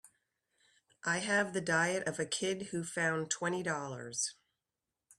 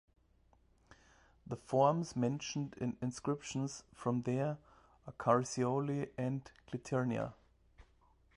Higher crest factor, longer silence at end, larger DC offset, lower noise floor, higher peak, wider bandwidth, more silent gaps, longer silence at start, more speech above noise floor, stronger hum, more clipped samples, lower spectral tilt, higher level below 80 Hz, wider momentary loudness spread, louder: about the same, 20 dB vs 22 dB; first, 0.85 s vs 0.55 s; neither; first, under -90 dBFS vs -70 dBFS; about the same, -16 dBFS vs -16 dBFS; first, 13.5 kHz vs 11.5 kHz; neither; second, 0.05 s vs 1.45 s; first, over 55 dB vs 34 dB; neither; neither; second, -3 dB/octave vs -6.5 dB/octave; second, -76 dBFS vs -68 dBFS; second, 7 LU vs 15 LU; first, -34 LUFS vs -37 LUFS